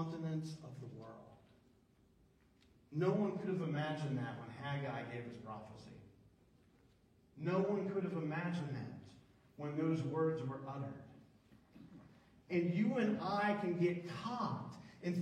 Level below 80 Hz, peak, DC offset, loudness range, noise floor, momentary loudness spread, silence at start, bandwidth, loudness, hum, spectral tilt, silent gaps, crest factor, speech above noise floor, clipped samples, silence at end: -76 dBFS; -22 dBFS; under 0.1%; 6 LU; -70 dBFS; 19 LU; 0 s; 10 kHz; -40 LUFS; none; -8 dB/octave; none; 18 dB; 32 dB; under 0.1%; 0 s